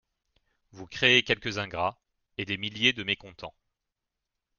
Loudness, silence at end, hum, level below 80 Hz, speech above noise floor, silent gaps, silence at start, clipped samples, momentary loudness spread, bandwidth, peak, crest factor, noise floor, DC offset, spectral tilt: -26 LUFS; 1.1 s; none; -62 dBFS; 57 dB; none; 0.75 s; under 0.1%; 21 LU; 7.2 kHz; -6 dBFS; 24 dB; -86 dBFS; under 0.1%; -3.5 dB/octave